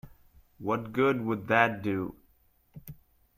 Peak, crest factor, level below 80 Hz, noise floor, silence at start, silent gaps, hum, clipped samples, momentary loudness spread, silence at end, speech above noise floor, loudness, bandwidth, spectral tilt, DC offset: -8 dBFS; 24 dB; -62 dBFS; -66 dBFS; 0.05 s; none; none; under 0.1%; 24 LU; 0.45 s; 38 dB; -29 LUFS; 15.5 kHz; -7 dB/octave; under 0.1%